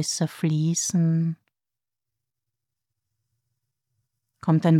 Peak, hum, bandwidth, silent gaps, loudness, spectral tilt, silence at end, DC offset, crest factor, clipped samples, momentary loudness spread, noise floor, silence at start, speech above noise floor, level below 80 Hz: -8 dBFS; none; 13.5 kHz; none; -24 LUFS; -5.5 dB/octave; 0 s; under 0.1%; 18 dB; under 0.1%; 8 LU; under -90 dBFS; 0 s; over 68 dB; -74 dBFS